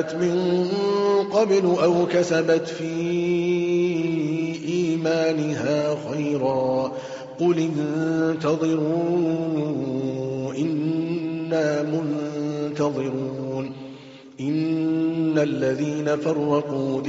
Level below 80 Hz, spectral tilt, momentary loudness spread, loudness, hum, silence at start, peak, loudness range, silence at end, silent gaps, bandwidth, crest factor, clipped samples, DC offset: -64 dBFS; -6.5 dB/octave; 7 LU; -23 LUFS; none; 0 s; -8 dBFS; 5 LU; 0 s; none; 7.8 kHz; 14 dB; under 0.1%; under 0.1%